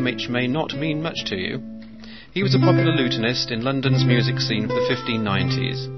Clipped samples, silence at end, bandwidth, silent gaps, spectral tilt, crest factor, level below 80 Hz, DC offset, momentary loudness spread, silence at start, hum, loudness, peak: under 0.1%; 0 s; 6.2 kHz; none; -6 dB/octave; 18 dB; -52 dBFS; 0.5%; 11 LU; 0 s; none; -21 LUFS; -4 dBFS